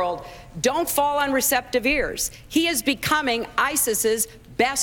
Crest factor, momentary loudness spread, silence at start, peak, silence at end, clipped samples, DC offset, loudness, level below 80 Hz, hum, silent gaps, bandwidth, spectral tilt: 18 dB; 6 LU; 0 s; -6 dBFS; 0 s; under 0.1%; under 0.1%; -22 LUFS; -46 dBFS; none; none; 18.5 kHz; -2 dB/octave